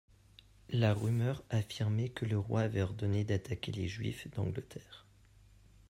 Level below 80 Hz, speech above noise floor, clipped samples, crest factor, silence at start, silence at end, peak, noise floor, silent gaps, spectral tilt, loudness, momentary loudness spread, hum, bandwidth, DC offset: -62 dBFS; 28 dB; under 0.1%; 20 dB; 0.7 s; 0.9 s; -16 dBFS; -62 dBFS; none; -7 dB/octave; -35 LUFS; 10 LU; none; 13 kHz; under 0.1%